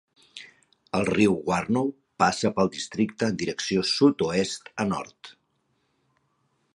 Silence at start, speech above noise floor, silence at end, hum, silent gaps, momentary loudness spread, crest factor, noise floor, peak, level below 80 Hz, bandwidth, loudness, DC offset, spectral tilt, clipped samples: 0.35 s; 47 dB; 1.45 s; none; none; 13 LU; 20 dB; -72 dBFS; -6 dBFS; -58 dBFS; 11.5 kHz; -25 LUFS; under 0.1%; -5 dB/octave; under 0.1%